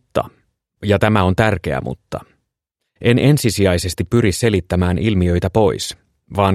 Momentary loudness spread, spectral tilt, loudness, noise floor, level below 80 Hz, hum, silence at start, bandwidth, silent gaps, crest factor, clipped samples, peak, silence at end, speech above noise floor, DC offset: 13 LU; -6 dB/octave; -17 LUFS; -77 dBFS; -38 dBFS; none; 0.15 s; 15 kHz; none; 16 dB; under 0.1%; 0 dBFS; 0 s; 62 dB; under 0.1%